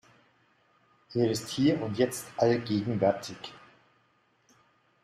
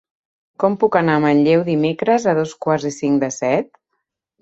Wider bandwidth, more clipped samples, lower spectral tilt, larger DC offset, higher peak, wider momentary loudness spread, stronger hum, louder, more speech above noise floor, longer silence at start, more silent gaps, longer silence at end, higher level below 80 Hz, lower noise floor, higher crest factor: first, 14 kHz vs 8 kHz; neither; about the same, -5.5 dB/octave vs -6 dB/octave; neither; second, -10 dBFS vs -2 dBFS; first, 11 LU vs 6 LU; neither; second, -29 LUFS vs -17 LUFS; second, 41 dB vs 58 dB; first, 1.1 s vs 0.6 s; neither; first, 1.45 s vs 0.8 s; second, -68 dBFS vs -60 dBFS; second, -69 dBFS vs -75 dBFS; about the same, 20 dB vs 16 dB